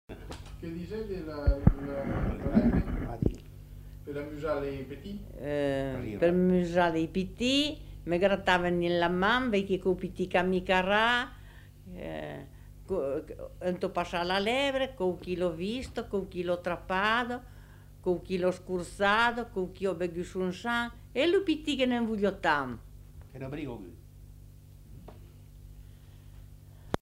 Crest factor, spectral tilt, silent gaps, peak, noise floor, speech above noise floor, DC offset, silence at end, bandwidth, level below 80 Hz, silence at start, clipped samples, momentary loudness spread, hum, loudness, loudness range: 24 dB; -6 dB/octave; none; -6 dBFS; -51 dBFS; 22 dB; under 0.1%; 0.05 s; 16 kHz; -44 dBFS; 0.1 s; under 0.1%; 16 LU; 50 Hz at -65 dBFS; -30 LUFS; 7 LU